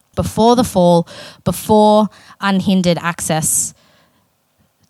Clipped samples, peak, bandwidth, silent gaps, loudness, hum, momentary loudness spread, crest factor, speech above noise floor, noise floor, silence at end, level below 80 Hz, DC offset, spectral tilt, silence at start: under 0.1%; 0 dBFS; 16 kHz; none; -15 LUFS; none; 10 LU; 16 dB; 46 dB; -60 dBFS; 1.2 s; -42 dBFS; under 0.1%; -5 dB/octave; 0.15 s